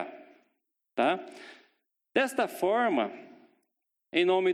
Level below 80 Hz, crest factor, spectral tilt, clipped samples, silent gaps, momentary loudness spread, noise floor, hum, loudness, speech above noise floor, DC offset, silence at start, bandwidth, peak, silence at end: -82 dBFS; 20 dB; -4.5 dB/octave; under 0.1%; none; 21 LU; -82 dBFS; none; -29 LUFS; 54 dB; under 0.1%; 0 s; 15 kHz; -12 dBFS; 0 s